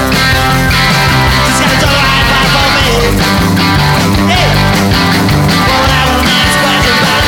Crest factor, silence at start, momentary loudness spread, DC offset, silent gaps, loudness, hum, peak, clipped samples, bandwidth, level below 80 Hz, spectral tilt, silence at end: 8 dB; 0 s; 1 LU; under 0.1%; none; -8 LUFS; none; 0 dBFS; under 0.1%; 19.5 kHz; -20 dBFS; -4 dB/octave; 0 s